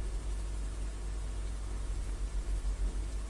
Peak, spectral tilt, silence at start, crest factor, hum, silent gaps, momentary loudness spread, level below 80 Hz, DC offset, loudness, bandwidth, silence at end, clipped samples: -26 dBFS; -5 dB/octave; 0 s; 10 dB; none; none; 3 LU; -36 dBFS; under 0.1%; -40 LUFS; 11.5 kHz; 0 s; under 0.1%